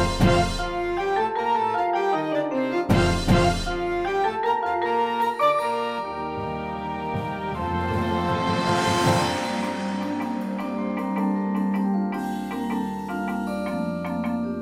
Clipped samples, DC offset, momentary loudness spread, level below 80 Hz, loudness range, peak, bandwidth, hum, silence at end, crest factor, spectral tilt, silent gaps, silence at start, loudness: under 0.1%; under 0.1%; 8 LU; -40 dBFS; 4 LU; -6 dBFS; 16 kHz; none; 0 s; 18 dB; -6 dB/octave; none; 0 s; -24 LUFS